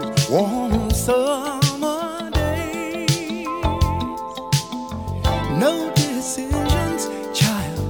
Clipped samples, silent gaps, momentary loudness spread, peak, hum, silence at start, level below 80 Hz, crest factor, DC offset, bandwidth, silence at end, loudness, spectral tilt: under 0.1%; none; 7 LU; -4 dBFS; none; 0 s; -30 dBFS; 18 dB; 0.1%; 19 kHz; 0 s; -21 LUFS; -5 dB/octave